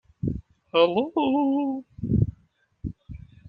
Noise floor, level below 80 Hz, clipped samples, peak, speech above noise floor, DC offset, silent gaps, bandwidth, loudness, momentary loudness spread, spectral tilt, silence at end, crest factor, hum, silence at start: -64 dBFS; -44 dBFS; under 0.1%; -6 dBFS; 41 dB; under 0.1%; none; 5 kHz; -25 LUFS; 17 LU; -10 dB/octave; 0.3 s; 20 dB; none; 0.25 s